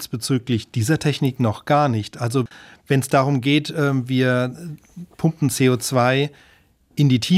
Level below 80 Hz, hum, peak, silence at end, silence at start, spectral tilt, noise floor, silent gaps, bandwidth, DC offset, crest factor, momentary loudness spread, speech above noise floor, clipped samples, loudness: -58 dBFS; none; -2 dBFS; 0 s; 0 s; -5.5 dB/octave; -56 dBFS; none; 15.5 kHz; under 0.1%; 16 dB; 9 LU; 36 dB; under 0.1%; -20 LUFS